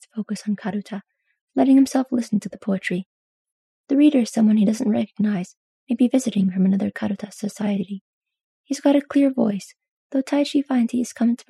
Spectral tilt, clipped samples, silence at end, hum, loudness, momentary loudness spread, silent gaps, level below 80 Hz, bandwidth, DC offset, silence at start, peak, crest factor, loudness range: -6.5 dB/octave; under 0.1%; 0.15 s; none; -21 LUFS; 13 LU; 1.41-1.47 s, 3.06-3.45 s, 3.52-3.84 s, 5.57-5.87 s, 8.01-8.21 s, 8.44-8.64 s, 9.91-10.10 s; -72 dBFS; 12.5 kHz; under 0.1%; 0.15 s; -6 dBFS; 16 dB; 3 LU